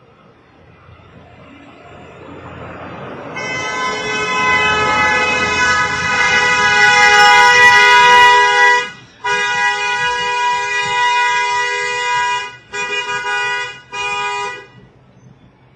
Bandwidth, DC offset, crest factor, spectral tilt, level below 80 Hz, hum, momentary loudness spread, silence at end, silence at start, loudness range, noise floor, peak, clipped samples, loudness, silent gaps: 15.5 kHz; under 0.1%; 14 dB; -1 dB/octave; -48 dBFS; none; 19 LU; 1.15 s; 1.85 s; 13 LU; -46 dBFS; 0 dBFS; under 0.1%; -12 LUFS; none